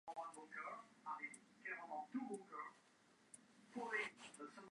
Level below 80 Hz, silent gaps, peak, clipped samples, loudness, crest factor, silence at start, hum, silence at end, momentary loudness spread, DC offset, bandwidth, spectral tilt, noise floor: under -90 dBFS; none; -32 dBFS; under 0.1%; -51 LUFS; 20 dB; 0.05 s; none; 0 s; 12 LU; under 0.1%; 11 kHz; -3.5 dB/octave; -73 dBFS